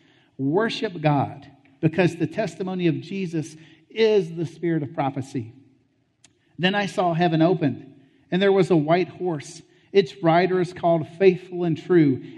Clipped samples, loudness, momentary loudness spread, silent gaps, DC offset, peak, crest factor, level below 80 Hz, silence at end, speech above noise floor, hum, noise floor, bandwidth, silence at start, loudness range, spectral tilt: under 0.1%; -23 LUFS; 11 LU; none; under 0.1%; -4 dBFS; 18 dB; -68 dBFS; 0 s; 43 dB; none; -65 dBFS; 10.5 kHz; 0.4 s; 4 LU; -7 dB/octave